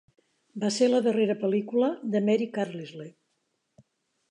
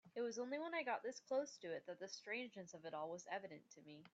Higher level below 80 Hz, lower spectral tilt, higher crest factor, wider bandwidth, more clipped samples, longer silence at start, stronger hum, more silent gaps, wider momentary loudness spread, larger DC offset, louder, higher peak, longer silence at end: first, -82 dBFS vs under -90 dBFS; first, -5.5 dB/octave vs -3.5 dB/octave; about the same, 16 dB vs 16 dB; first, 11 kHz vs 8 kHz; neither; first, 0.55 s vs 0.05 s; neither; neither; first, 19 LU vs 11 LU; neither; first, -26 LUFS vs -48 LUFS; first, -12 dBFS vs -32 dBFS; first, 1.2 s vs 0.05 s